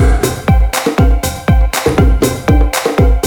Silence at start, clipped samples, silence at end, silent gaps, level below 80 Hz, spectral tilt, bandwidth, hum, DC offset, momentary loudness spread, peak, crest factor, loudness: 0 s; under 0.1%; 0 s; none; -14 dBFS; -5.5 dB/octave; 19 kHz; none; under 0.1%; 2 LU; 0 dBFS; 10 dB; -12 LUFS